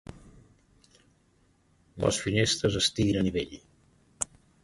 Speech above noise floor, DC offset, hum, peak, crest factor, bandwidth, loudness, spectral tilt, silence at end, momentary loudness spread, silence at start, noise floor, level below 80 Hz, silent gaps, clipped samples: 39 dB; under 0.1%; none; -10 dBFS; 22 dB; 11.5 kHz; -28 LUFS; -4 dB/octave; 0.4 s; 13 LU; 0.1 s; -66 dBFS; -50 dBFS; none; under 0.1%